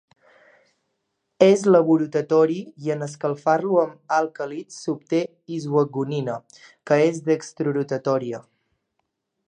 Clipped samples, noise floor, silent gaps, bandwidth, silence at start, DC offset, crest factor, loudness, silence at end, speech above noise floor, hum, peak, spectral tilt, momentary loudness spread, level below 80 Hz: under 0.1%; -76 dBFS; none; 9.8 kHz; 1.4 s; under 0.1%; 22 dB; -22 LUFS; 1.1 s; 55 dB; none; -2 dBFS; -6.5 dB/octave; 14 LU; -76 dBFS